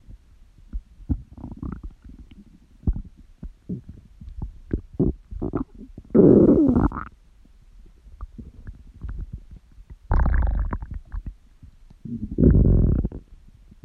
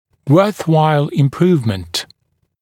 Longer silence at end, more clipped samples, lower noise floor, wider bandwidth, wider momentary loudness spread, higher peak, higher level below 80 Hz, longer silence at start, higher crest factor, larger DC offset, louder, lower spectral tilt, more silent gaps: about the same, 0.5 s vs 0.55 s; neither; second, -51 dBFS vs -65 dBFS; second, 2.5 kHz vs 16.5 kHz; first, 26 LU vs 10 LU; second, -4 dBFS vs 0 dBFS; first, -30 dBFS vs -52 dBFS; second, 0.1 s vs 0.25 s; about the same, 20 dB vs 16 dB; neither; second, -21 LUFS vs -15 LUFS; first, -12 dB/octave vs -7 dB/octave; neither